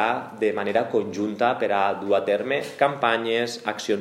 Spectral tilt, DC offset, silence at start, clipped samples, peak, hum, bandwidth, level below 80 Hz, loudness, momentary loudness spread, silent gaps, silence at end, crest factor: -4.5 dB/octave; under 0.1%; 0 s; under 0.1%; -4 dBFS; none; 14 kHz; -76 dBFS; -24 LUFS; 5 LU; none; 0 s; 20 dB